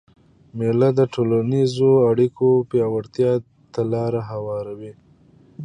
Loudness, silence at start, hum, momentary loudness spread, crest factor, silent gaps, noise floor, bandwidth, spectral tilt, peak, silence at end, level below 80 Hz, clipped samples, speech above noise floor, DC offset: -20 LUFS; 0.55 s; none; 14 LU; 16 dB; none; -52 dBFS; 10 kHz; -8.5 dB/octave; -4 dBFS; 0 s; -58 dBFS; under 0.1%; 33 dB; under 0.1%